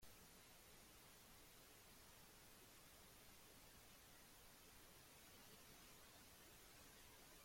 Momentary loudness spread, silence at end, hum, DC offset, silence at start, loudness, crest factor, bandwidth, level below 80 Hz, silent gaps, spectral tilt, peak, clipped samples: 1 LU; 0 s; none; under 0.1%; 0 s; -65 LUFS; 14 dB; 16.5 kHz; -76 dBFS; none; -2 dB/octave; -52 dBFS; under 0.1%